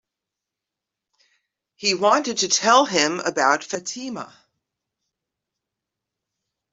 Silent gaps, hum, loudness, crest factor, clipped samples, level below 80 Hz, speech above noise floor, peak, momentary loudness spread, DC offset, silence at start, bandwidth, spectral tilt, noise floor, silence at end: none; none; -20 LUFS; 22 dB; under 0.1%; -72 dBFS; 65 dB; -2 dBFS; 16 LU; under 0.1%; 1.8 s; 8.2 kHz; -1.5 dB/octave; -86 dBFS; 2.45 s